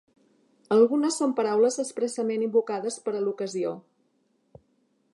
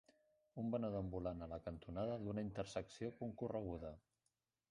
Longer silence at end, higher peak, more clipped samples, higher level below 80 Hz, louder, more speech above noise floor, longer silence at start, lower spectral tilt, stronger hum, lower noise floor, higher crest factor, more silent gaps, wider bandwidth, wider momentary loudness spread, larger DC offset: first, 1.35 s vs 0.7 s; first, -8 dBFS vs -30 dBFS; neither; second, -78 dBFS vs -64 dBFS; first, -26 LUFS vs -47 LUFS; about the same, 45 dB vs 44 dB; first, 0.7 s vs 0.55 s; second, -4.5 dB/octave vs -7.5 dB/octave; neither; second, -70 dBFS vs -89 dBFS; about the same, 18 dB vs 18 dB; neither; about the same, 11.5 kHz vs 11 kHz; about the same, 9 LU vs 8 LU; neither